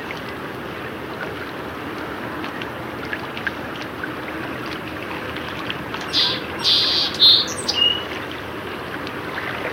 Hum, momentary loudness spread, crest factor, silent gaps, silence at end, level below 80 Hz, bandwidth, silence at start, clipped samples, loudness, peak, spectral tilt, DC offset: none; 15 LU; 22 dB; none; 0 s; -50 dBFS; 17 kHz; 0 s; under 0.1%; -21 LUFS; -2 dBFS; -2.5 dB/octave; under 0.1%